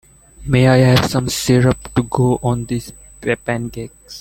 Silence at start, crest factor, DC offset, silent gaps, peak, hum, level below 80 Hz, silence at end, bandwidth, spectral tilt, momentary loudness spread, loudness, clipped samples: 0.4 s; 14 dB; under 0.1%; none; -2 dBFS; none; -38 dBFS; 0 s; 16.5 kHz; -6 dB/octave; 17 LU; -16 LUFS; under 0.1%